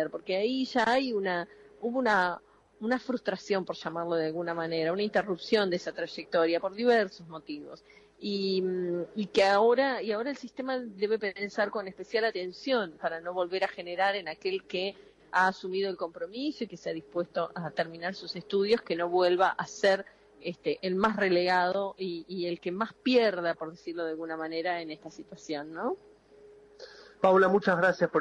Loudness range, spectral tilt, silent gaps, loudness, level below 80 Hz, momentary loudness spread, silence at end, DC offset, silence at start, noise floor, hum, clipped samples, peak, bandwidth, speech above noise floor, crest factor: 4 LU; -5.5 dB/octave; none; -30 LUFS; -70 dBFS; 12 LU; 0 s; under 0.1%; 0 s; -55 dBFS; none; under 0.1%; -12 dBFS; 10.5 kHz; 26 dB; 18 dB